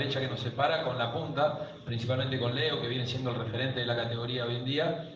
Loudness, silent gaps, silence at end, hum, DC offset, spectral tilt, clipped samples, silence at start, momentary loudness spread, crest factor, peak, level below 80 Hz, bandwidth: -31 LUFS; none; 0 s; none; under 0.1%; -6.5 dB/octave; under 0.1%; 0 s; 4 LU; 18 dB; -14 dBFS; -62 dBFS; 7.4 kHz